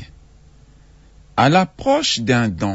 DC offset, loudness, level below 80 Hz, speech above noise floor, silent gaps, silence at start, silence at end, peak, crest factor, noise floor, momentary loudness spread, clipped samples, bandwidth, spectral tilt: under 0.1%; -17 LUFS; -46 dBFS; 31 dB; none; 0 s; 0 s; -2 dBFS; 18 dB; -47 dBFS; 3 LU; under 0.1%; 8 kHz; -5 dB/octave